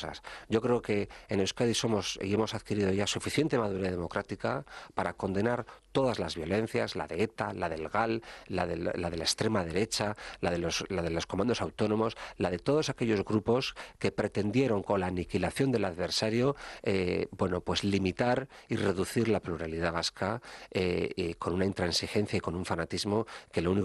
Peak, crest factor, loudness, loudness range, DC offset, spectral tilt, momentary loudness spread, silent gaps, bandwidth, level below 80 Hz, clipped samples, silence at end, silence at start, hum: -14 dBFS; 18 dB; -31 LUFS; 2 LU; under 0.1%; -5 dB/octave; 6 LU; none; 12.5 kHz; -58 dBFS; under 0.1%; 0 s; 0 s; none